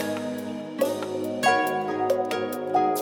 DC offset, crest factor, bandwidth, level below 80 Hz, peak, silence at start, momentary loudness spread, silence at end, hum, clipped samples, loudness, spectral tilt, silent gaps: under 0.1%; 18 dB; 17.5 kHz; -76 dBFS; -8 dBFS; 0 s; 9 LU; 0 s; none; under 0.1%; -26 LUFS; -4 dB/octave; none